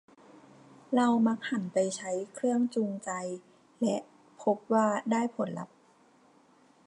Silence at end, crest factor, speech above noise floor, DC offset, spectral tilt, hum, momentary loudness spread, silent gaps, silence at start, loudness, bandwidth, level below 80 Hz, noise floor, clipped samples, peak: 1.2 s; 18 dB; 33 dB; under 0.1%; -5.5 dB/octave; none; 10 LU; none; 0.9 s; -30 LUFS; 11 kHz; -84 dBFS; -62 dBFS; under 0.1%; -14 dBFS